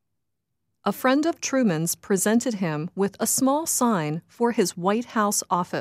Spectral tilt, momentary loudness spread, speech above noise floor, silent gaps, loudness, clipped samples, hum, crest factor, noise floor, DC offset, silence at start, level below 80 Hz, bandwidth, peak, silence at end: -4 dB/octave; 6 LU; 58 dB; none; -23 LUFS; under 0.1%; none; 16 dB; -81 dBFS; under 0.1%; 0.85 s; -70 dBFS; 15.5 kHz; -8 dBFS; 0 s